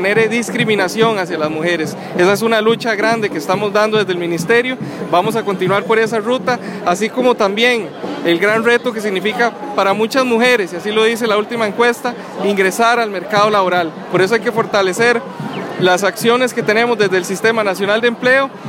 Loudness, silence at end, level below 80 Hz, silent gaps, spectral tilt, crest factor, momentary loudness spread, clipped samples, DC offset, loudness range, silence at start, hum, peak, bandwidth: -15 LUFS; 0 s; -62 dBFS; none; -4.5 dB/octave; 14 dB; 6 LU; under 0.1%; under 0.1%; 1 LU; 0 s; none; 0 dBFS; 16.5 kHz